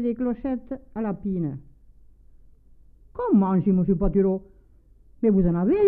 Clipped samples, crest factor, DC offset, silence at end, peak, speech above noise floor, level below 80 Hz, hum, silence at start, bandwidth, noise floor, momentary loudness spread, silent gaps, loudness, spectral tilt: under 0.1%; 16 dB; under 0.1%; 0 s; -8 dBFS; 32 dB; -40 dBFS; none; 0 s; 3.1 kHz; -54 dBFS; 11 LU; none; -24 LUFS; -13 dB/octave